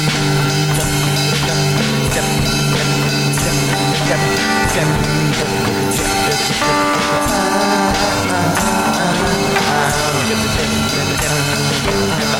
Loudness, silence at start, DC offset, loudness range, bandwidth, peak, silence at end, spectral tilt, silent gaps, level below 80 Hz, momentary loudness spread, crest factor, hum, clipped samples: -15 LUFS; 0 s; under 0.1%; 0 LU; 16.5 kHz; -2 dBFS; 0 s; -4 dB/octave; none; -32 dBFS; 1 LU; 12 dB; none; under 0.1%